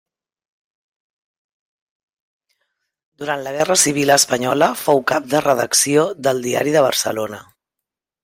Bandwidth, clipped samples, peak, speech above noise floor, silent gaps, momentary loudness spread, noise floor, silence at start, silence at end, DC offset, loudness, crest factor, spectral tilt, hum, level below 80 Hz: 16.5 kHz; under 0.1%; 0 dBFS; 67 dB; none; 11 LU; -84 dBFS; 3.2 s; 0.8 s; under 0.1%; -16 LUFS; 20 dB; -2.5 dB/octave; none; -62 dBFS